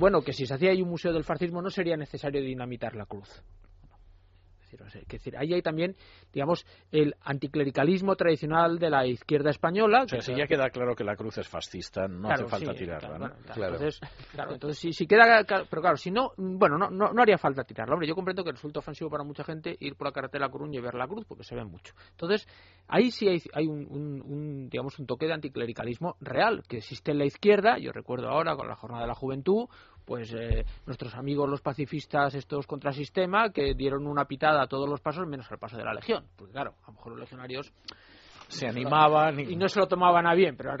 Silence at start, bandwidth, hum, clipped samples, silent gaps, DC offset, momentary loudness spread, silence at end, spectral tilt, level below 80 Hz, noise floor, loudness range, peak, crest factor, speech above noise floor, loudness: 0 s; 7.4 kHz; none; under 0.1%; none; under 0.1%; 16 LU; 0 s; -4 dB/octave; -50 dBFS; -58 dBFS; 10 LU; -2 dBFS; 26 dB; 30 dB; -28 LUFS